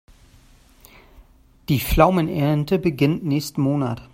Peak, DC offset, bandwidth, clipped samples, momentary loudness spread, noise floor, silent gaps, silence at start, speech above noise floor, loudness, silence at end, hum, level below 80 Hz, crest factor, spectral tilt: 0 dBFS; under 0.1%; 16 kHz; under 0.1%; 7 LU; -51 dBFS; none; 1.7 s; 32 dB; -20 LUFS; 0.1 s; none; -36 dBFS; 22 dB; -7 dB/octave